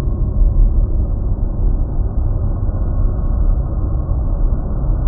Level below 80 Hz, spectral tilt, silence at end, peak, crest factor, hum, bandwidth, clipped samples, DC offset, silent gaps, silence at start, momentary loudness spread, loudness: -16 dBFS; -11.5 dB/octave; 0 s; -2 dBFS; 12 dB; none; 1.6 kHz; under 0.1%; under 0.1%; none; 0 s; 4 LU; -20 LUFS